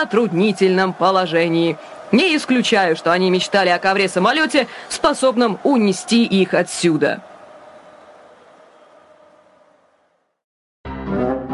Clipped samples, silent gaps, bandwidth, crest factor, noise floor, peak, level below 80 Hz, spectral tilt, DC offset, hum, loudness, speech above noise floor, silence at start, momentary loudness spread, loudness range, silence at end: under 0.1%; 10.44-10.84 s; 11.5 kHz; 18 dB; -63 dBFS; -2 dBFS; -50 dBFS; -4.5 dB/octave; under 0.1%; none; -17 LUFS; 47 dB; 0 s; 6 LU; 9 LU; 0 s